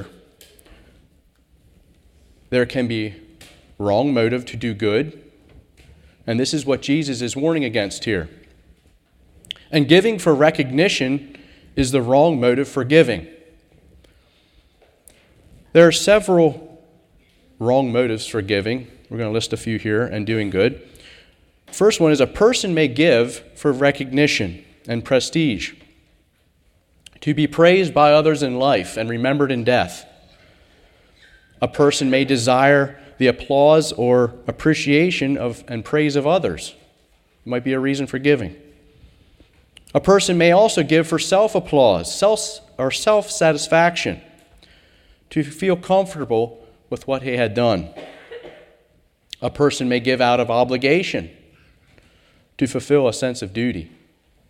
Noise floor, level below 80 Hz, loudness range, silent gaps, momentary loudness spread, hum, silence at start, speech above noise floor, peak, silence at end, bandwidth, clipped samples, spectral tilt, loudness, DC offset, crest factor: -60 dBFS; -48 dBFS; 6 LU; none; 14 LU; none; 0 s; 43 dB; 0 dBFS; 0.65 s; 15.5 kHz; under 0.1%; -5 dB/octave; -18 LUFS; under 0.1%; 20 dB